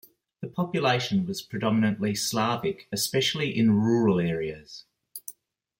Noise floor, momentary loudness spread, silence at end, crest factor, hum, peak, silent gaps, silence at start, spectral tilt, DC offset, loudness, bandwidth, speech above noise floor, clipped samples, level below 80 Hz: -54 dBFS; 18 LU; 0.5 s; 16 dB; none; -10 dBFS; none; 0.4 s; -5 dB/octave; under 0.1%; -26 LUFS; 16.5 kHz; 28 dB; under 0.1%; -62 dBFS